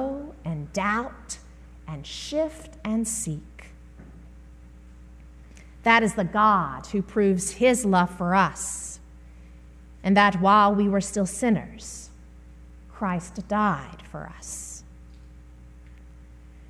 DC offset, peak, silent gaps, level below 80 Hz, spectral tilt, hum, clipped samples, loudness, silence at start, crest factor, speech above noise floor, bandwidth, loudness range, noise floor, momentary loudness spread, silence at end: under 0.1%; -6 dBFS; none; -46 dBFS; -4.5 dB/octave; 60 Hz at -45 dBFS; under 0.1%; -24 LUFS; 0 s; 20 dB; 23 dB; 13.5 kHz; 10 LU; -46 dBFS; 19 LU; 0.05 s